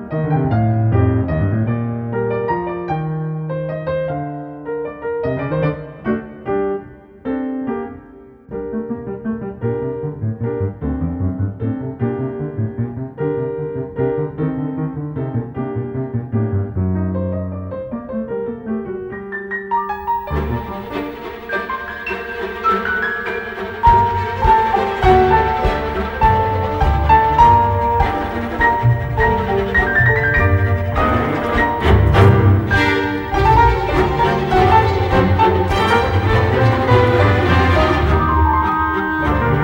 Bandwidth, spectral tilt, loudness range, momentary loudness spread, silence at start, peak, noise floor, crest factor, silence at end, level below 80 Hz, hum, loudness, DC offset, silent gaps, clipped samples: 16.5 kHz; -8 dB/octave; 9 LU; 12 LU; 0 s; 0 dBFS; -41 dBFS; 16 dB; 0 s; -28 dBFS; none; -17 LUFS; under 0.1%; none; under 0.1%